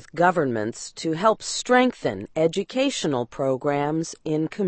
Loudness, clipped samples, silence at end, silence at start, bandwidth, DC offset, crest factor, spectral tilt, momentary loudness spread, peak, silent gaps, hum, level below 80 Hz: -24 LUFS; under 0.1%; 0 s; 0.15 s; 8.8 kHz; under 0.1%; 18 dB; -4.5 dB/octave; 9 LU; -4 dBFS; none; none; -60 dBFS